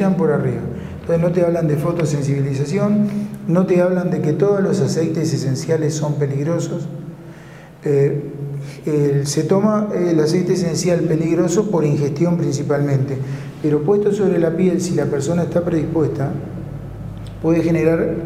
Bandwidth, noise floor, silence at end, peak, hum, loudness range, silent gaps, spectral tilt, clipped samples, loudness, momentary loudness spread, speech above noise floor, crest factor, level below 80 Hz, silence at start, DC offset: 14.5 kHz; -38 dBFS; 0 s; -2 dBFS; none; 4 LU; none; -7 dB/octave; under 0.1%; -18 LUFS; 11 LU; 21 dB; 16 dB; -46 dBFS; 0 s; under 0.1%